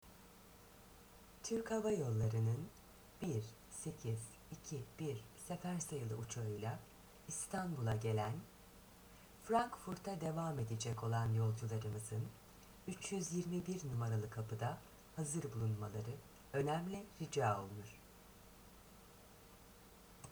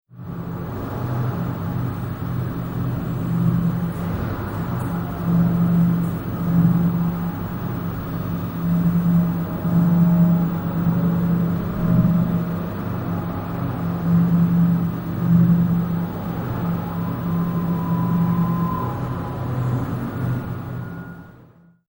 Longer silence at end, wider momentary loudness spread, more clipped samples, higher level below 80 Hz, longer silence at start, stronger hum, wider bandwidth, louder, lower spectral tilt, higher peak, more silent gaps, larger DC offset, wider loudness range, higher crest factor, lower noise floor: second, 0 s vs 0.45 s; first, 22 LU vs 10 LU; neither; second, -66 dBFS vs -40 dBFS; about the same, 0.05 s vs 0.15 s; neither; first, over 20 kHz vs 16.5 kHz; second, -43 LUFS vs -22 LUFS; second, -6 dB/octave vs -9.5 dB/octave; second, -22 dBFS vs -6 dBFS; neither; neither; about the same, 4 LU vs 5 LU; first, 22 dB vs 16 dB; first, -62 dBFS vs -50 dBFS